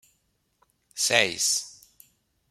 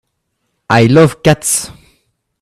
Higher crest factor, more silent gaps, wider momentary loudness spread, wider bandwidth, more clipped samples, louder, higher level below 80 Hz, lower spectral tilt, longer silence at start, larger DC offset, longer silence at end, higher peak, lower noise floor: first, 28 dB vs 14 dB; neither; first, 21 LU vs 8 LU; about the same, 16.5 kHz vs 16 kHz; neither; second, -23 LUFS vs -10 LUFS; second, -72 dBFS vs -44 dBFS; second, 0 dB/octave vs -5 dB/octave; first, 0.95 s vs 0.7 s; neither; about the same, 0.8 s vs 0.75 s; about the same, -2 dBFS vs 0 dBFS; first, -72 dBFS vs -68 dBFS